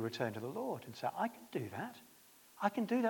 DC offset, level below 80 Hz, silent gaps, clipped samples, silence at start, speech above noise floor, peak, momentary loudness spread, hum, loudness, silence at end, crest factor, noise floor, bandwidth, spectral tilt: under 0.1%; -86 dBFS; none; under 0.1%; 0 s; 24 dB; -18 dBFS; 21 LU; none; -41 LUFS; 0 s; 20 dB; -63 dBFS; 18 kHz; -6 dB/octave